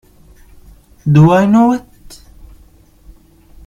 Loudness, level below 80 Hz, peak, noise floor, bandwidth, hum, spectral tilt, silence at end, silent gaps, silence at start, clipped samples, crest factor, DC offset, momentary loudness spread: -11 LUFS; -42 dBFS; 0 dBFS; -45 dBFS; 11 kHz; none; -8.5 dB/octave; 1.9 s; none; 1.05 s; under 0.1%; 16 dB; under 0.1%; 13 LU